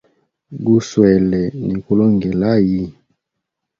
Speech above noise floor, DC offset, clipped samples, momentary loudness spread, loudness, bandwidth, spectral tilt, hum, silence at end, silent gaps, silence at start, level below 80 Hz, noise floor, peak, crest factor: 63 dB; under 0.1%; under 0.1%; 10 LU; -16 LUFS; 7.4 kHz; -8 dB/octave; none; 0.9 s; none; 0.5 s; -44 dBFS; -78 dBFS; 0 dBFS; 16 dB